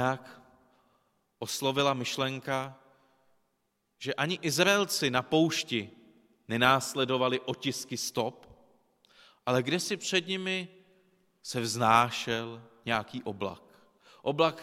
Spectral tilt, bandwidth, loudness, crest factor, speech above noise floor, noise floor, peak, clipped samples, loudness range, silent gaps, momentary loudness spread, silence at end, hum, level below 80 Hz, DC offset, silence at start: -3.5 dB/octave; 16.5 kHz; -29 LUFS; 24 dB; 48 dB; -78 dBFS; -8 dBFS; under 0.1%; 6 LU; none; 14 LU; 0 s; none; -68 dBFS; under 0.1%; 0 s